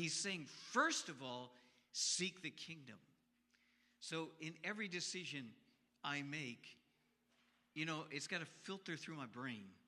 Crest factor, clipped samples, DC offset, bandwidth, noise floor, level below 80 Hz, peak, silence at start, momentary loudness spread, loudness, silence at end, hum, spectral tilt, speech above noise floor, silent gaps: 26 dB; under 0.1%; under 0.1%; 14 kHz; -80 dBFS; under -90 dBFS; -22 dBFS; 0 s; 15 LU; -45 LUFS; 0.1 s; none; -2.5 dB/octave; 34 dB; none